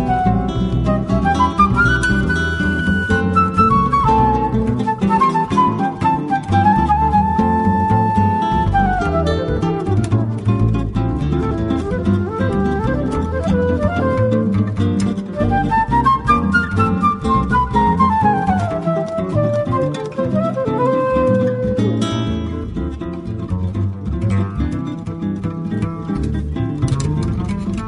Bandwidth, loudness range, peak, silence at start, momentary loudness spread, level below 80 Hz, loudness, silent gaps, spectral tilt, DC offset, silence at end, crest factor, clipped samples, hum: 11 kHz; 6 LU; -2 dBFS; 0 s; 8 LU; -28 dBFS; -17 LUFS; none; -7.5 dB/octave; under 0.1%; 0 s; 16 dB; under 0.1%; none